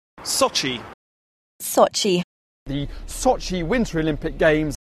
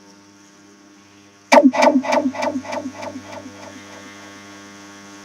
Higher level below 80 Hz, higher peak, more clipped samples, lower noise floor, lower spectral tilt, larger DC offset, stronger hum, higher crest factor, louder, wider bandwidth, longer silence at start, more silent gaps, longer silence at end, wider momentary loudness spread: first, -38 dBFS vs -70 dBFS; about the same, -2 dBFS vs 0 dBFS; neither; first, under -90 dBFS vs -48 dBFS; about the same, -4 dB/octave vs -3.5 dB/octave; neither; neither; about the same, 20 dB vs 22 dB; second, -22 LUFS vs -17 LUFS; second, 13.5 kHz vs 15 kHz; second, 0.15 s vs 1.5 s; first, 0.94-1.59 s, 2.24-2.66 s vs none; first, 0.2 s vs 0 s; second, 13 LU vs 26 LU